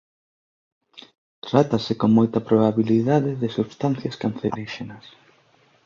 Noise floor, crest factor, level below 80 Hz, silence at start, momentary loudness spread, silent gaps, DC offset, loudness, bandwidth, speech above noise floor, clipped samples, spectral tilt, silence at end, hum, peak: -59 dBFS; 20 dB; -58 dBFS; 0.95 s; 13 LU; 1.18-1.42 s; under 0.1%; -21 LUFS; 7.2 kHz; 38 dB; under 0.1%; -8 dB/octave; 0.85 s; none; -2 dBFS